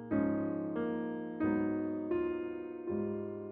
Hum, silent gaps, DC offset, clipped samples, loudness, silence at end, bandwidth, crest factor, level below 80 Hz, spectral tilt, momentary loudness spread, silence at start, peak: none; none; under 0.1%; under 0.1%; -36 LUFS; 0 s; 3.7 kHz; 14 dB; -66 dBFS; -8 dB/octave; 7 LU; 0 s; -20 dBFS